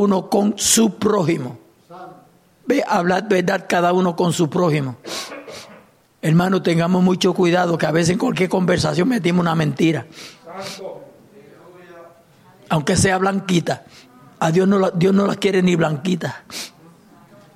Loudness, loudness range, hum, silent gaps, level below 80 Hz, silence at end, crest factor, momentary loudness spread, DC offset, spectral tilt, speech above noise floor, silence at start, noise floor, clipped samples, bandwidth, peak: -18 LUFS; 5 LU; none; none; -52 dBFS; 0.9 s; 16 dB; 17 LU; under 0.1%; -5 dB/octave; 33 dB; 0 s; -51 dBFS; under 0.1%; 15 kHz; -2 dBFS